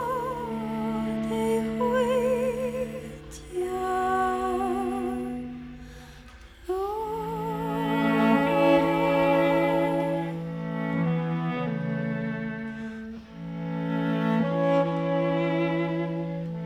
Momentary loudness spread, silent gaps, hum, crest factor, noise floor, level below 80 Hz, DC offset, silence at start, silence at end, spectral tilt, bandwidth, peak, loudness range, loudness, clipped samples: 15 LU; none; none; 16 dB; -47 dBFS; -52 dBFS; under 0.1%; 0 s; 0 s; -7 dB/octave; 15.5 kHz; -10 dBFS; 7 LU; -27 LUFS; under 0.1%